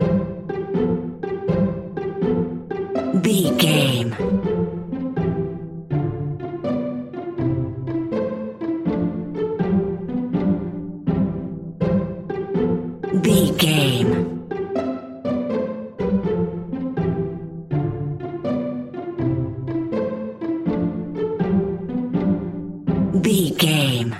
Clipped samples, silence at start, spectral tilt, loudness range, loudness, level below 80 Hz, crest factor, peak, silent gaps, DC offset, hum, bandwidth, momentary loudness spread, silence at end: under 0.1%; 0 s; -6 dB/octave; 5 LU; -22 LUFS; -44 dBFS; 18 dB; -4 dBFS; none; under 0.1%; none; 16 kHz; 10 LU; 0 s